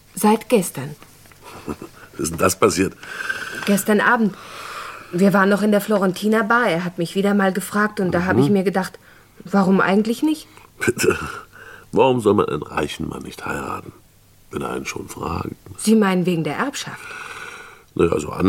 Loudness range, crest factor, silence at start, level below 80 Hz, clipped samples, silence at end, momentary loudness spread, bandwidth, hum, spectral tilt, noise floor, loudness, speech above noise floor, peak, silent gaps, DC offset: 5 LU; 18 dB; 0.15 s; -52 dBFS; under 0.1%; 0 s; 16 LU; 17 kHz; none; -5.5 dB/octave; -51 dBFS; -19 LUFS; 32 dB; -2 dBFS; none; under 0.1%